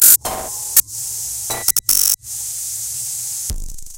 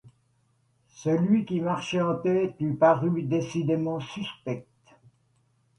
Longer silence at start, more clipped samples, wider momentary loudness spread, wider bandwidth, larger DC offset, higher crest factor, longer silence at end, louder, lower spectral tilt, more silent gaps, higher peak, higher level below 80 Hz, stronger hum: about the same, 0 s vs 0.05 s; first, 0.1% vs under 0.1%; about the same, 11 LU vs 13 LU; first, over 20 kHz vs 11 kHz; neither; about the same, 18 dB vs 20 dB; second, 0 s vs 1.15 s; first, -16 LUFS vs -26 LUFS; second, 0.5 dB/octave vs -7 dB/octave; neither; first, 0 dBFS vs -8 dBFS; first, -36 dBFS vs -66 dBFS; neither